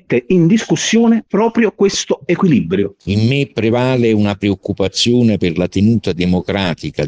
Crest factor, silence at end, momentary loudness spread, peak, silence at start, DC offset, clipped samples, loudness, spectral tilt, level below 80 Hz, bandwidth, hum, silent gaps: 12 dB; 0 s; 6 LU; -2 dBFS; 0.1 s; under 0.1%; under 0.1%; -14 LUFS; -5.5 dB/octave; -48 dBFS; 9.8 kHz; none; none